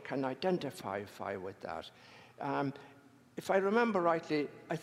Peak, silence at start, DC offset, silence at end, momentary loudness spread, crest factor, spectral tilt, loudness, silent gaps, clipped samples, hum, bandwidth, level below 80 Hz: -16 dBFS; 0 s; under 0.1%; 0 s; 15 LU; 20 dB; -6 dB/octave; -35 LUFS; none; under 0.1%; none; 15.5 kHz; -80 dBFS